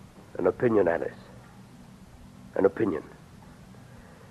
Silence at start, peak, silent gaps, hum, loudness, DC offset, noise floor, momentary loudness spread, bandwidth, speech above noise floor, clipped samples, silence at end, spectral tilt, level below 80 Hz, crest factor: 0.15 s; -10 dBFS; none; none; -27 LUFS; under 0.1%; -49 dBFS; 26 LU; 12.5 kHz; 24 dB; under 0.1%; 0.3 s; -8 dB/octave; -58 dBFS; 20 dB